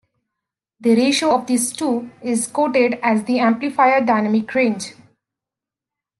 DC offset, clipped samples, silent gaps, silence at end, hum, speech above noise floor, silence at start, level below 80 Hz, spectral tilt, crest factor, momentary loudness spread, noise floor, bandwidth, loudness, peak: under 0.1%; under 0.1%; none; 1.3 s; none; 70 dB; 0.8 s; -68 dBFS; -4 dB/octave; 16 dB; 8 LU; -87 dBFS; 12.5 kHz; -18 LUFS; -2 dBFS